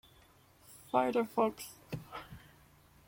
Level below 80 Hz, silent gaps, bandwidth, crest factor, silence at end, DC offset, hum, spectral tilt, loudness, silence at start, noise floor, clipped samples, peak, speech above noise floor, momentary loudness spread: -68 dBFS; none; 16.5 kHz; 24 dB; 0.7 s; under 0.1%; none; -5.5 dB/octave; -34 LUFS; 0.7 s; -63 dBFS; under 0.1%; -14 dBFS; 30 dB; 24 LU